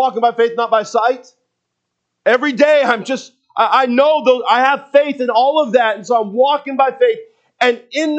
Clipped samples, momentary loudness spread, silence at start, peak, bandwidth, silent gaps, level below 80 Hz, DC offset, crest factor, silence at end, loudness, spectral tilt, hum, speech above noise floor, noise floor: under 0.1%; 7 LU; 0 s; 0 dBFS; 8.4 kHz; none; -76 dBFS; under 0.1%; 14 dB; 0 s; -14 LUFS; -4 dB/octave; none; 61 dB; -74 dBFS